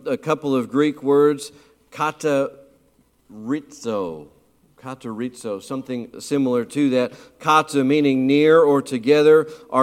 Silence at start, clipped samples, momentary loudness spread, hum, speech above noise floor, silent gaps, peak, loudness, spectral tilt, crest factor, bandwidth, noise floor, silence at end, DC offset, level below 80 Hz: 0.05 s; under 0.1%; 16 LU; none; 40 dB; none; -2 dBFS; -20 LUFS; -6 dB/octave; 18 dB; 14 kHz; -60 dBFS; 0 s; under 0.1%; -66 dBFS